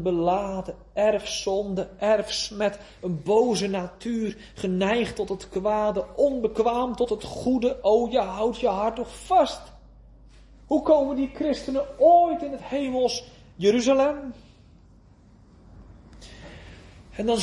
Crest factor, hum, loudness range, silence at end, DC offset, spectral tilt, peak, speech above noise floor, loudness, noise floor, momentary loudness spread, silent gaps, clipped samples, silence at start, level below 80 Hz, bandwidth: 18 dB; none; 4 LU; 0 s; under 0.1%; -5 dB/octave; -6 dBFS; 29 dB; -24 LUFS; -53 dBFS; 12 LU; none; under 0.1%; 0 s; -50 dBFS; 11.5 kHz